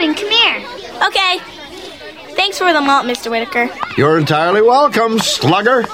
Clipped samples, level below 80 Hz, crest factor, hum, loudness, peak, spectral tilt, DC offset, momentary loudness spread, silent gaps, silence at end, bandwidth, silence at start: under 0.1%; -52 dBFS; 14 dB; none; -13 LUFS; -2 dBFS; -4 dB/octave; 0.2%; 18 LU; none; 0 s; 16.5 kHz; 0 s